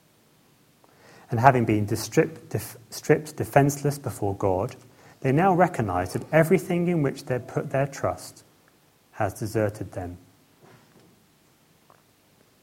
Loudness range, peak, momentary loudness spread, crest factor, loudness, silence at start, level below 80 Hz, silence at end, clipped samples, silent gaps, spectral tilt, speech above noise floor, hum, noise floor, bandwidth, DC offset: 10 LU; 0 dBFS; 13 LU; 26 dB; -25 LUFS; 1.3 s; -58 dBFS; 2.45 s; under 0.1%; none; -6.5 dB/octave; 36 dB; none; -60 dBFS; 16.5 kHz; under 0.1%